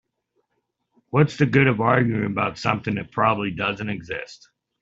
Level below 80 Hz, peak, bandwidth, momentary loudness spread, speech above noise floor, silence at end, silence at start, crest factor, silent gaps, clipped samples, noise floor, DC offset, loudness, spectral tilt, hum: -56 dBFS; -2 dBFS; 7.8 kHz; 12 LU; 54 dB; 0.45 s; 1.15 s; 20 dB; none; under 0.1%; -75 dBFS; under 0.1%; -22 LUFS; -7 dB/octave; none